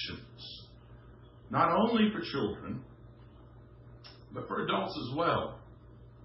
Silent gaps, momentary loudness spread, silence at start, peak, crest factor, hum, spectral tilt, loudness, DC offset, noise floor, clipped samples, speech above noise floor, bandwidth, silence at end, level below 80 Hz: none; 25 LU; 0 s; -14 dBFS; 20 dB; none; -9.5 dB/octave; -32 LUFS; under 0.1%; -54 dBFS; under 0.1%; 23 dB; 5.8 kHz; 0 s; -58 dBFS